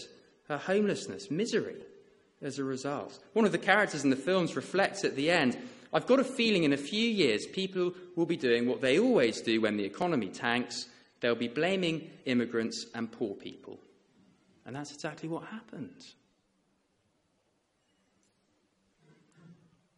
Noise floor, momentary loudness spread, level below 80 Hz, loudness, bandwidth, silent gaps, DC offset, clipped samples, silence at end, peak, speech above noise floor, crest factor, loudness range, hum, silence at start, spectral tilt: -75 dBFS; 16 LU; -74 dBFS; -30 LUFS; 11 kHz; none; under 0.1%; under 0.1%; 0.45 s; -8 dBFS; 45 dB; 24 dB; 16 LU; none; 0 s; -4.5 dB/octave